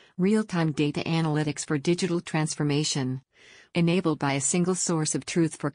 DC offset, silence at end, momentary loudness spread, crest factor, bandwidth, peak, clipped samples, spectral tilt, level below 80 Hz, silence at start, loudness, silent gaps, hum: under 0.1%; 0.05 s; 4 LU; 14 dB; 10 kHz; -14 dBFS; under 0.1%; -5 dB/octave; -64 dBFS; 0.2 s; -26 LUFS; none; none